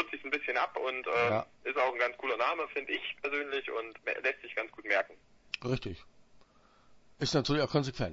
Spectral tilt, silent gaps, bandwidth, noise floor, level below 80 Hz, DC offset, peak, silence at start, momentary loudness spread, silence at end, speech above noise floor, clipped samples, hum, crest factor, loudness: -3 dB/octave; none; 7.6 kHz; -62 dBFS; -60 dBFS; under 0.1%; -14 dBFS; 0 s; 8 LU; 0 s; 29 dB; under 0.1%; none; 20 dB; -33 LUFS